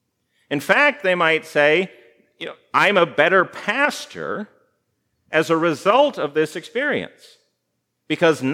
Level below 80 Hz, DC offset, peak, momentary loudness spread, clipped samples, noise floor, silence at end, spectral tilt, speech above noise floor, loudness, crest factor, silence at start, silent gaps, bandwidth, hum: -76 dBFS; under 0.1%; 0 dBFS; 14 LU; under 0.1%; -75 dBFS; 0 s; -4.5 dB/octave; 55 dB; -19 LUFS; 20 dB; 0.5 s; none; 16 kHz; none